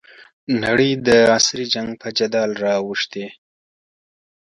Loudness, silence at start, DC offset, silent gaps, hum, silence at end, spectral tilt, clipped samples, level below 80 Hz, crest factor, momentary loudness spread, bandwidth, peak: -18 LUFS; 0.2 s; under 0.1%; 0.33-0.47 s; none; 1.1 s; -3.5 dB/octave; under 0.1%; -54 dBFS; 18 dB; 12 LU; 11.5 kHz; -2 dBFS